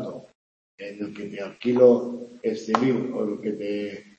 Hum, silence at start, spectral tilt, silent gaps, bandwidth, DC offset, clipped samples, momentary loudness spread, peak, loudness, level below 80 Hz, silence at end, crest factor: none; 0 s; -7 dB/octave; 0.35-0.78 s; 7.8 kHz; under 0.1%; under 0.1%; 18 LU; -2 dBFS; -24 LUFS; -72 dBFS; 0.15 s; 24 dB